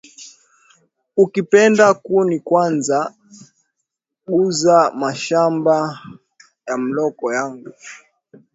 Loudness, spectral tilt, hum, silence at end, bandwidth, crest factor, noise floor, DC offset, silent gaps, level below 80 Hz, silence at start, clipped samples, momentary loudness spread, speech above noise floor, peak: -17 LUFS; -5 dB/octave; none; 0.6 s; 8 kHz; 18 dB; -77 dBFS; under 0.1%; none; -66 dBFS; 0.2 s; under 0.1%; 23 LU; 61 dB; 0 dBFS